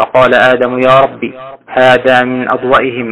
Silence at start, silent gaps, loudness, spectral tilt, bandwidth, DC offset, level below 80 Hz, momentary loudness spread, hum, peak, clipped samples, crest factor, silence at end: 0 s; none; -9 LUFS; -6 dB/octave; 10.5 kHz; 0.6%; -44 dBFS; 9 LU; none; 0 dBFS; under 0.1%; 10 dB; 0 s